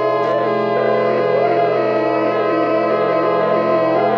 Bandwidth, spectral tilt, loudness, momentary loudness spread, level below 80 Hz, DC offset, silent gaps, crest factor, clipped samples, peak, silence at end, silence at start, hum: 6.4 kHz; -7.5 dB/octave; -16 LUFS; 1 LU; -68 dBFS; under 0.1%; none; 12 dB; under 0.1%; -4 dBFS; 0 s; 0 s; none